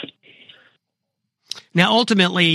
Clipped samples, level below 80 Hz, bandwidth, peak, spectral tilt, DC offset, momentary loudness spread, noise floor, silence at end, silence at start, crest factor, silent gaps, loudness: under 0.1%; -64 dBFS; 13 kHz; 0 dBFS; -5 dB/octave; under 0.1%; 19 LU; -79 dBFS; 0 s; 0 s; 20 dB; none; -16 LUFS